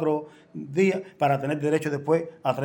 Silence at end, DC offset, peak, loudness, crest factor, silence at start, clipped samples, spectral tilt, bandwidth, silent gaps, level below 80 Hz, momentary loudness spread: 0 s; under 0.1%; -10 dBFS; -25 LUFS; 16 dB; 0 s; under 0.1%; -7 dB/octave; 17 kHz; none; -70 dBFS; 7 LU